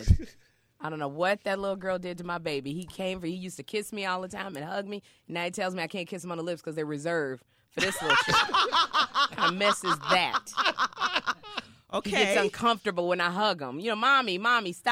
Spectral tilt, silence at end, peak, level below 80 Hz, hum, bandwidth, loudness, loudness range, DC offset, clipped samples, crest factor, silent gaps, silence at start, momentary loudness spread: -4 dB/octave; 0 s; -8 dBFS; -44 dBFS; none; 16.5 kHz; -28 LUFS; 9 LU; under 0.1%; under 0.1%; 22 dB; none; 0 s; 13 LU